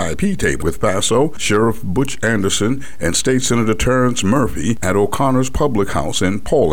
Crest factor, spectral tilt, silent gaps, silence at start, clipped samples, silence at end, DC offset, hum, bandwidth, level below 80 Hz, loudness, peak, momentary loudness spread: 12 dB; -4.5 dB/octave; none; 0 s; under 0.1%; 0 s; 8%; none; 18 kHz; -32 dBFS; -17 LUFS; -4 dBFS; 4 LU